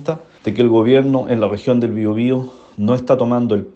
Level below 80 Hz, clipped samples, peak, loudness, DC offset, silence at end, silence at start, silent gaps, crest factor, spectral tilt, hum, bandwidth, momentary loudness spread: -56 dBFS; under 0.1%; 0 dBFS; -16 LUFS; under 0.1%; 0.05 s; 0 s; none; 14 dB; -8.5 dB/octave; none; 7.6 kHz; 11 LU